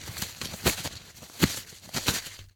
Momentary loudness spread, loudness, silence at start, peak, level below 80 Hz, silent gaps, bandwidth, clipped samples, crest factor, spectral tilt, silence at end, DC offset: 10 LU; -30 LUFS; 0 s; -4 dBFS; -46 dBFS; none; over 20 kHz; under 0.1%; 28 dB; -3 dB/octave; 0.05 s; under 0.1%